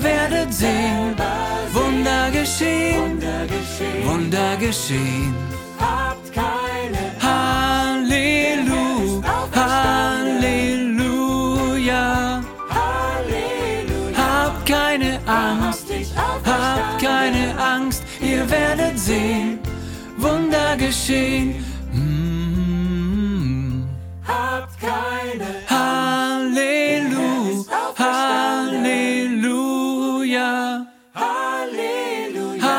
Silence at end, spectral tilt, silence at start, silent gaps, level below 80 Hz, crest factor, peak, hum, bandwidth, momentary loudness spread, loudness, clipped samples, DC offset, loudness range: 0 s; -4.5 dB/octave; 0 s; none; -34 dBFS; 18 dB; -2 dBFS; none; 17 kHz; 7 LU; -20 LUFS; under 0.1%; under 0.1%; 3 LU